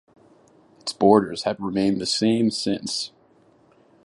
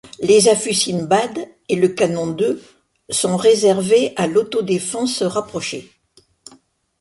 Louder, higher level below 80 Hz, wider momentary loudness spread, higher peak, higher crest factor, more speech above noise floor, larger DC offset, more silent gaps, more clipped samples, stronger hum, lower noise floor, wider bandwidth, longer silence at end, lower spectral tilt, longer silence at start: second, -22 LUFS vs -17 LUFS; about the same, -60 dBFS vs -60 dBFS; about the same, 13 LU vs 12 LU; about the same, -2 dBFS vs 0 dBFS; about the same, 22 dB vs 18 dB; about the same, 36 dB vs 39 dB; neither; neither; neither; neither; about the same, -57 dBFS vs -56 dBFS; about the same, 11.5 kHz vs 11.5 kHz; second, 1 s vs 1.2 s; about the same, -5 dB/octave vs -4 dB/octave; first, 0.85 s vs 0.05 s